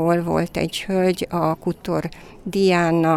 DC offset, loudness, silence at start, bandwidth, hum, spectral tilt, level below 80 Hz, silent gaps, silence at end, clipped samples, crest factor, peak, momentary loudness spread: under 0.1%; -21 LUFS; 0 s; 14.5 kHz; none; -6 dB/octave; -46 dBFS; none; 0 s; under 0.1%; 14 dB; -6 dBFS; 9 LU